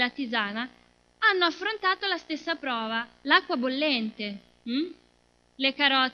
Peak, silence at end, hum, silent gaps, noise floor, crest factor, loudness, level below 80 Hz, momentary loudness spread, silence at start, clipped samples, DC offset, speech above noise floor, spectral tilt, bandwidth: -6 dBFS; 0 s; 60 Hz at -60 dBFS; none; -65 dBFS; 22 dB; -26 LUFS; -70 dBFS; 13 LU; 0 s; under 0.1%; under 0.1%; 37 dB; -4 dB/octave; 7 kHz